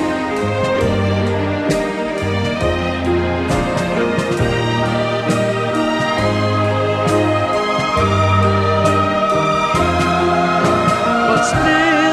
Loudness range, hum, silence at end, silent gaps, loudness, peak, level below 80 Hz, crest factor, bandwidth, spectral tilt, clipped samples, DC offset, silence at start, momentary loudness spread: 3 LU; none; 0 s; none; -16 LUFS; -2 dBFS; -36 dBFS; 14 dB; 13.5 kHz; -5.5 dB/octave; under 0.1%; under 0.1%; 0 s; 4 LU